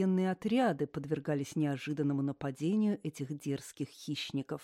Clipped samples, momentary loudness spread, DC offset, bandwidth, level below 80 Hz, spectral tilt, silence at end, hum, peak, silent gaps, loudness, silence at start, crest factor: under 0.1%; 9 LU; under 0.1%; 14.5 kHz; -72 dBFS; -6.5 dB/octave; 0 s; none; -18 dBFS; none; -34 LUFS; 0 s; 16 dB